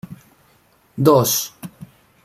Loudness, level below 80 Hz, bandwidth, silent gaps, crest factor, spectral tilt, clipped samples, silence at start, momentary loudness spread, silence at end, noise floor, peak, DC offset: -16 LUFS; -60 dBFS; 16 kHz; none; 20 dB; -5 dB/octave; under 0.1%; 0.1 s; 24 LU; 0.4 s; -57 dBFS; -2 dBFS; under 0.1%